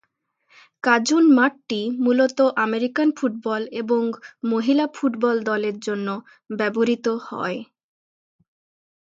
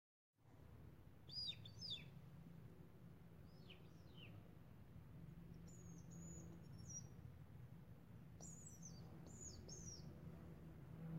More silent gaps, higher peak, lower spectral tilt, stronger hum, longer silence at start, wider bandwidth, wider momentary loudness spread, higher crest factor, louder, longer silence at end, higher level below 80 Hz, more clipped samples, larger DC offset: neither; first, -2 dBFS vs -40 dBFS; about the same, -4.5 dB/octave vs -4 dB/octave; neither; first, 0.85 s vs 0.3 s; second, 7.8 kHz vs 16 kHz; about the same, 11 LU vs 13 LU; about the same, 20 dB vs 18 dB; first, -21 LUFS vs -58 LUFS; first, 1.4 s vs 0 s; about the same, -74 dBFS vs -70 dBFS; neither; neither